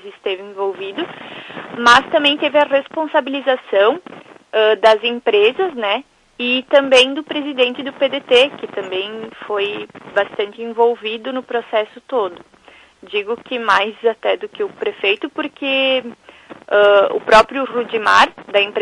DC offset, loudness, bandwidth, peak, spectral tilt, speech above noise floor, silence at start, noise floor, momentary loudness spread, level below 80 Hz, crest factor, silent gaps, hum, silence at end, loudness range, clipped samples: under 0.1%; -16 LUFS; 11.5 kHz; 0 dBFS; -2.5 dB/octave; 28 dB; 0.05 s; -45 dBFS; 13 LU; -54 dBFS; 16 dB; none; none; 0 s; 6 LU; under 0.1%